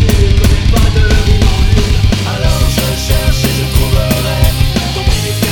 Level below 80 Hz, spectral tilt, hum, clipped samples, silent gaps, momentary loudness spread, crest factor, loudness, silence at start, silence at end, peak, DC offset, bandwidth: -12 dBFS; -5 dB/octave; none; 0.2%; none; 3 LU; 10 dB; -12 LUFS; 0 s; 0 s; 0 dBFS; under 0.1%; over 20 kHz